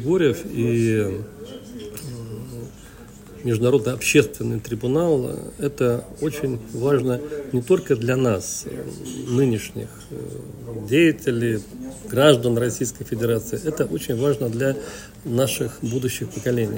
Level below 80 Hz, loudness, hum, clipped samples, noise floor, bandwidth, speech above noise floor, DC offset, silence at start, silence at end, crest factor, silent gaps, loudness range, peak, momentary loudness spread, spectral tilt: -50 dBFS; -22 LUFS; none; under 0.1%; -42 dBFS; 16.5 kHz; 20 dB; under 0.1%; 0 s; 0 s; 22 dB; none; 3 LU; 0 dBFS; 17 LU; -5.5 dB/octave